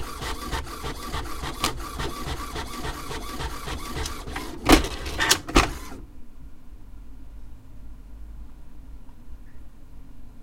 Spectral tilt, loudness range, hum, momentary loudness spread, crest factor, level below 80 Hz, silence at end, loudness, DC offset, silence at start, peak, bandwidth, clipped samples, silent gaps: -3.5 dB/octave; 23 LU; none; 29 LU; 28 dB; -34 dBFS; 0 s; -26 LUFS; under 0.1%; 0 s; 0 dBFS; 16 kHz; under 0.1%; none